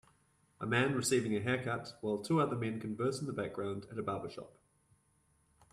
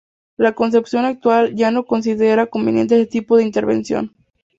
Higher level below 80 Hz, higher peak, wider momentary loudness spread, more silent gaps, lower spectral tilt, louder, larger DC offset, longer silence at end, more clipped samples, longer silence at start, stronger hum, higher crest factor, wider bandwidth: second, -70 dBFS vs -58 dBFS; second, -16 dBFS vs -2 dBFS; first, 9 LU vs 5 LU; neither; second, -5 dB/octave vs -6.5 dB/octave; second, -36 LUFS vs -17 LUFS; neither; first, 1.25 s vs 0.5 s; neither; first, 0.6 s vs 0.4 s; neither; first, 22 dB vs 14 dB; first, 13 kHz vs 7.8 kHz